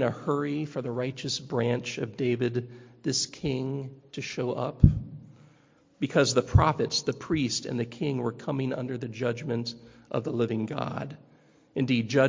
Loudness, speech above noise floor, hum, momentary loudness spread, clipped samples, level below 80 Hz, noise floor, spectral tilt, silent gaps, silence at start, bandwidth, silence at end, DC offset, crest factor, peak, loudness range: -29 LUFS; 33 dB; none; 13 LU; under 0.1%; -40 dBFS; -61 dBFS; -5.5 dB/octave; none; 0 s; 7.6 kHz; 0 s; under 0.1%; 26 dB; -2 dBFS; 5 LU